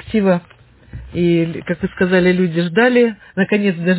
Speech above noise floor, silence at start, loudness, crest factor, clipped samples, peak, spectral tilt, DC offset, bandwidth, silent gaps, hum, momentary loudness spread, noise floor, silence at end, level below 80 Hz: 21 dB; 0.05 s; -16 LUFS; 14 dB; under 0.1%; -2 dBFS; -11 dB/octave; under 0.1%; 4 kHz; none; none; 9 LU; -36 dBFS; 0 s; -44 dBFS